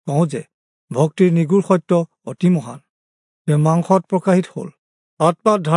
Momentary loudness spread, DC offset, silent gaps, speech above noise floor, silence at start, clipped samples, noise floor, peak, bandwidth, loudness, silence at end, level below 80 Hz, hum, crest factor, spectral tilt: 14 LU; under 0.1%; 0.54-0.88 s, 2.90-3.45 s, 4.78-5.17 s; over 74 dB; 0.05 s; under 0.1%; under -90 dBFS; -2 dBFS; 11 kHz; -17 LUFS; 0 s; -70 dBFS; none; 16 dB; -8 dB/octave